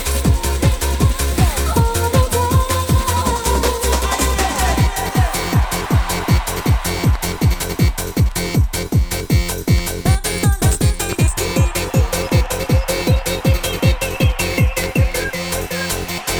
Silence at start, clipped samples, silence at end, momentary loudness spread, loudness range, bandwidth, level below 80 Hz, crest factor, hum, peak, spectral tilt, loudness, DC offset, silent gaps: 0 s; under 0.1%; 0 s; 2 LU; 1 LU; over 20 kHz; -20 dBFS; 14 dB; none; -2 dBFS; -4.5 dB/octave; -17 LUFS; under 0.1%; none